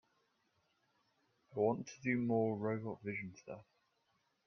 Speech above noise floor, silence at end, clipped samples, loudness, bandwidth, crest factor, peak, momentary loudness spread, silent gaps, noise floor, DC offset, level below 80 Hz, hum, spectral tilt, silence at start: 42 dB; 0.85 s; under 0.1%; -38 LUFS; 6.6 kHz; 20 dB; -22 dBFS; 16 LU; none; -80 dBFS; under 0.1%; -80 dBFS; none; -7.5 dB/octave; 1.5 s